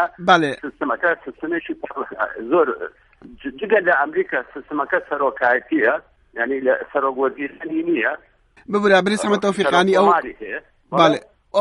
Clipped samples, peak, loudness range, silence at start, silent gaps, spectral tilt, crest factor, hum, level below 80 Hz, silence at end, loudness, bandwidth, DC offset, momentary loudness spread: under 0.1%; 0 dBFS; 4 LU; 0 s; none; -5 dB/octave; 20 dB; none; -58 dBFS; 0 s; -19 LUFS; 11.5 kHz; under 0.1%; 14 LU